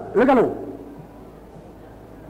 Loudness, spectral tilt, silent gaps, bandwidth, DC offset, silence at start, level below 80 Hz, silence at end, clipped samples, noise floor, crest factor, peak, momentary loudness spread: -19 LUFS; -7.5 dB/octave; none; 15.5 kHz; under 0.1%; 0 s; -50 dBFS; 0 s; under 0.1%; -42 dBFS; 16 dB; -6 dBFS; 26 LU